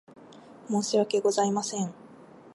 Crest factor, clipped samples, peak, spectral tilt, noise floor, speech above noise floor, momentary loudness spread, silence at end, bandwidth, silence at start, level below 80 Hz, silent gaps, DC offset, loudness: 16 dB; under 0.1%; -12 dBFS; -4.5 dB/octave; -50 dBFS; 24 dB; 10 LU; 0.05 s; 11.5 kHz; 0.2 s; -78 dBFS; none; under 0.1%; -27 LUFS